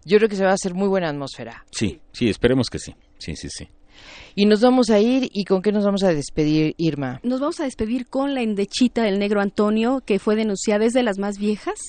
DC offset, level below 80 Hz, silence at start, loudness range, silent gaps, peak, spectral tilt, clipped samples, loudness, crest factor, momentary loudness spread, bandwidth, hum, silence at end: under 0.1%; -46 dBFS; 0.05 s; 5 LU; none; -2 dBFS; -5.5 dB/octave; under 0.1%; -20 LUFS; 18 dB; 15 LU; 9.6 kHz; none; 0 s